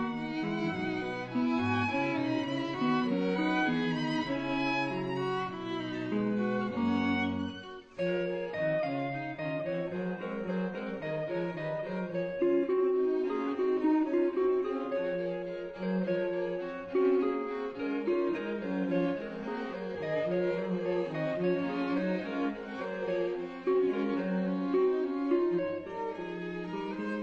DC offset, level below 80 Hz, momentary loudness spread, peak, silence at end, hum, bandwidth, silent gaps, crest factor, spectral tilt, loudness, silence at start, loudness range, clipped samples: under 0.1%; -64 dBFS; 8 LU; -18 dBFS; 0 s; none; 7.8 kHz; none; 14 dB; -7.5 dB/octave; -32 LUFS; 0 s; 3 LU; under 0.1%